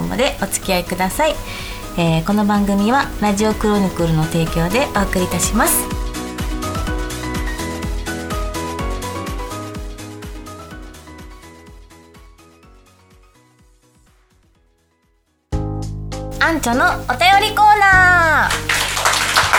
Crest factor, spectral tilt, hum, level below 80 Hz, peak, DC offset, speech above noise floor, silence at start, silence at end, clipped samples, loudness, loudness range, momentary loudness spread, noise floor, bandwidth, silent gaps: 18 dB; -4 dB/octave; none; -30 dBFS; 0 dBFS; under 0.1%; 46 dB; 0 s; 0 s; under 0.1%; -17 LUFS; 19 LU; 18 LU; -61 dBFS; over 20 kHz; none